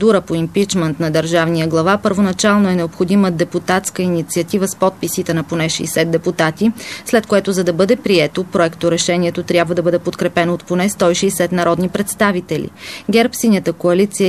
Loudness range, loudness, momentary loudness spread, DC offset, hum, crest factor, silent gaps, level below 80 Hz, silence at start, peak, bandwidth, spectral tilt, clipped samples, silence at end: 2 LU; -16 LUFS; 4 LU; 0.2%; none; 14 dB; none; -48 dBFS; 0 s; 0 dBFS; 14 kHz; -5 dB/octave; under 0.1%; 0 s